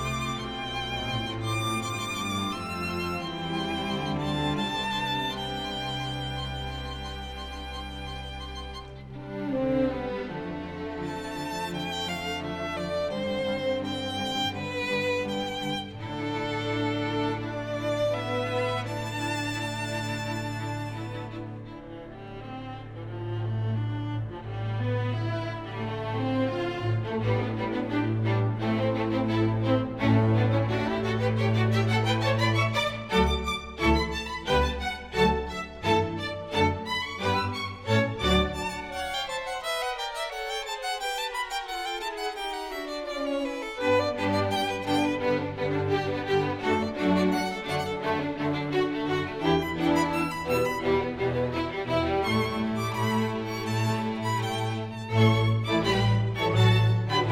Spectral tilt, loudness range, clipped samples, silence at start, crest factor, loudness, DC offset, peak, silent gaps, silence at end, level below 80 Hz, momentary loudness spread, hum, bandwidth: -6 dB/octave; 7 LU; under 0.1%; 0 s; 18 dB; -28 LUFS; under 0.1%; -10 dBFS; none; 0 s; -44 dBFS; 10 LU; none; 15.5 kHz